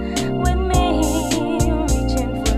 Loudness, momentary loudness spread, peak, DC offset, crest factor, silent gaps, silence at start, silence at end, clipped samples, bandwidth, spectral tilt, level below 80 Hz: -19 LUFS; 3 LU; -4 dBFS; under 0.1%; 14 dB; none; 0 s; 0 s; under 0.1%; 15.5 kHz; -5.5 dB/octave; -22 dBFS